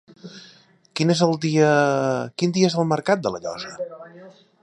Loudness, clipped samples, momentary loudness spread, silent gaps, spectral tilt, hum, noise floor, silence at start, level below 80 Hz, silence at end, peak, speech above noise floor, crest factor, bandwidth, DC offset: -21 LUFS; under 0.1%; 19 LU; none; -5.5 dB/octave; none; -53 dBFS; 0.25 s; -66 dBFS; 0.3 s; -4 dBFS; 32 dB; 18 dB; 11 kHz; under 0.1%